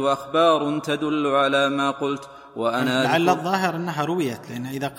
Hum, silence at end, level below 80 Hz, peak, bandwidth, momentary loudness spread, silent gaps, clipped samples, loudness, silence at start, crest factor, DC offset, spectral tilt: none; 0 s; -64 dBFS; -4 dBFS; 16.5 kHz; 9 LU; none; under 0.1%; -22 LUFS; 0 s; 18 dB; under 0.1%; -5 dB/octave